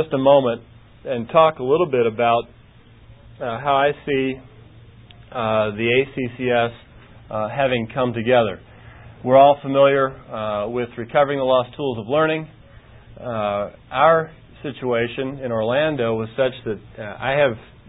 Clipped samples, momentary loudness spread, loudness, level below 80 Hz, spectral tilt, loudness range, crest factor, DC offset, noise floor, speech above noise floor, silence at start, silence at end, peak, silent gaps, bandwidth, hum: under 0.1%; 15 LU; -20 LUFS; -52 dBFS; -11 dB/octave; 5 LU; 18 dB; under 0.1%; -48 dBFS; 28 dB; 0 s; 0.25 s; -2 dBFS; none; 4 kHz; none